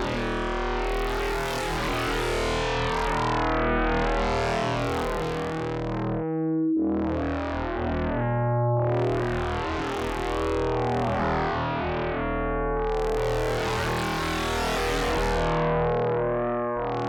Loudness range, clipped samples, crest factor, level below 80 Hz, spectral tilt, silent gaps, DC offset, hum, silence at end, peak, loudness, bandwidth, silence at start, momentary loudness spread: 1 LU; under 0.1%; 6 dB; -36 dBFS; -6 dB/octave; none; under 0.1%; none; 0 s; -20 dBFS; -26 LUFS; over 20 kHz; 0 s; 4 LU